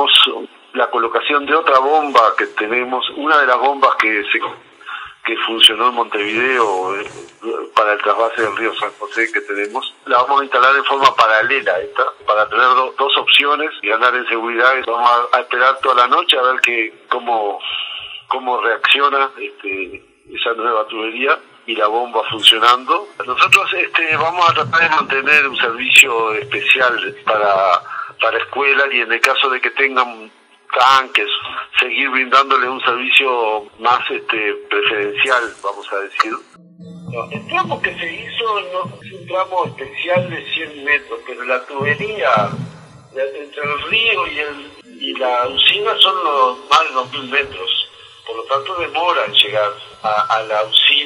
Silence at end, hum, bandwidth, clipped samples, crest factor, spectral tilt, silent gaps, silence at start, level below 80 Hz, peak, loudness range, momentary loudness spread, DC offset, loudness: 0 s; none; 11.5 kHz; 0.1%; 16 dB; -2.5 dB/octave; none; 0 s; -62 dBFS; 0 dBFS; 7 LU; 13 LU; under 0.1%; -15 LUFS